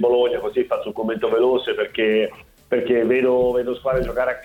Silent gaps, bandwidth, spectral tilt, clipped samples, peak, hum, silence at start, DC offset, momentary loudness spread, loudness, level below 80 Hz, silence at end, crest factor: none; 16 kHz; -6.5 dB/octave; under 0.1%; -8 dBFS; none; 0 s; under 0.1%; 6 LU; -20 LUFS; -44 dBFS; 0 s; 12 dB